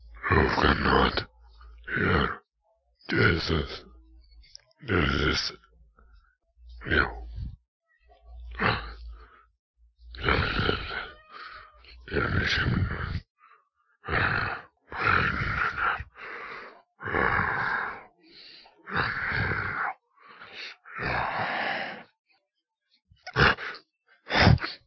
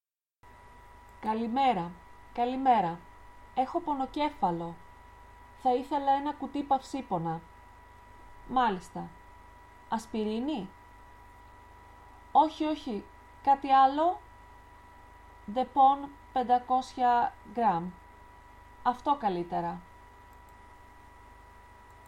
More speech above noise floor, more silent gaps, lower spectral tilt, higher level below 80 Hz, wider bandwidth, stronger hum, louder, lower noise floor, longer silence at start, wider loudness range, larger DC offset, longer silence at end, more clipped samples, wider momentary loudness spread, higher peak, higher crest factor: first, 56 dB vs 32 dB; first, 7.68-7.80 s, 9.59-9.74 s, 13.30-13.35 s, 22.19-22.24 s vs none; about the same, -6 dB/octave vs -6 dB/octave; first, -40 dBFS vs -58 dBFS; second, 6.6 kHz vs 11.5 kHz; neither; first, -27 LUFS vs -30 LUFS; first, -82 dBFS vs -61 dBFS; second, 0 s vs 0.65 s; about the same, 5 LU vs 7 LU; neither; second, 0.1 s vs 2 s; neither; first, 21 LU vs 16 LU; first, -6 dBFS vs -12 dBFS; first, 24 dB vs 18 dB